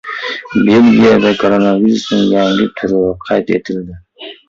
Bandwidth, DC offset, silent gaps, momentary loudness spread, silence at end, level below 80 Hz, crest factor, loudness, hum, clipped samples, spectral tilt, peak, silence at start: 7.6 kHz; under 0.1%; none; 15 LU; 0.15 s; -44 dBFS; 12 dB; -11 LUFS; none; under 0.1%; -6.5 dB/octave; 0 dBFS; 0.05 s